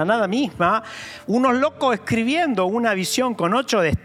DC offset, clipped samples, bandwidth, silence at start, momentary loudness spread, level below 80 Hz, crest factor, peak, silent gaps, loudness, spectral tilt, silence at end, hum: under 0.1%; under 0.1%; 15.5 kHz; 0 s; 4 LU; -50 dBFS; 16 dB; -4 dBFS; none; -20 LUFS; -4.5 dB/octave; 0.05 s; none